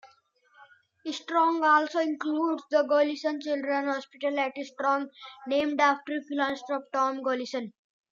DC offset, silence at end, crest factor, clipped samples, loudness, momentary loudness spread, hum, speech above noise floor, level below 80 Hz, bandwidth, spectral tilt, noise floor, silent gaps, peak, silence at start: under 0.1%; 0.45 s; 18 dB; under 0.1%; -28 LUFS; 12 LU; none; 36 dB; -78 dBFS; 7.6 kHz; -3 dB/octave; -64 dBFS; none; -10 dBFS; 0.05 s